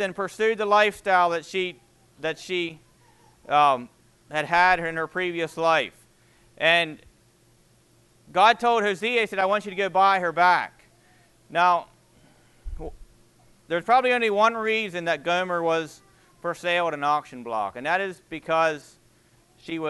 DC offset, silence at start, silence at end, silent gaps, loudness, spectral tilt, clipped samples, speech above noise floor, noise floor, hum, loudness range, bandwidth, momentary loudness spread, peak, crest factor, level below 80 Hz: under 0.1%; 0 s; 0 s; none; -23 LUFS; -4 dB/octave; under 0.1%; 36 dB; -59 dBFS; none; 5 LU; 12.5 kHz; 13 LU; -4 dBFS; 20 dB; -52 dBFS